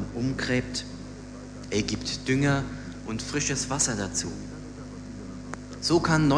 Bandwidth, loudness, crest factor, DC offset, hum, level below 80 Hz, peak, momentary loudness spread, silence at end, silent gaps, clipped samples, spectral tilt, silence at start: 11 kHz; -27 LUFS; 20 dB; under 0.1%; 50 Hz at -45 dBFS; -46 dBFS; -10 dBFS; 16 LU; 0 s; none; under 0.1%; -4 dB/octave; 0 s